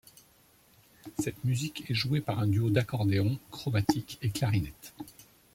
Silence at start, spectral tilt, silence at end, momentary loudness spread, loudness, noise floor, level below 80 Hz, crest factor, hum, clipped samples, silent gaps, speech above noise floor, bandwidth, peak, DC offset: 1.05 s; -6 dB/octave; 0.3 s; 16 LU; -31 LUFS; -62 dBFS; -58 dBFS; 20 dB; none; under 0.1%; none; 33 dB; 16.5 kHz; -10 dBFS; under 0.1%